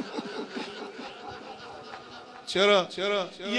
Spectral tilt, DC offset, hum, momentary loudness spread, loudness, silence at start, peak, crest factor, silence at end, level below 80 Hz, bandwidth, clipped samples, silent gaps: -3.5 dB/octave; under 0.1%; none; 21 LU; -27 LUFS; 0 s; -10 dBFS; 20 dB; 0 s; -72 dBFS; 11 kHz; under 0.1%; none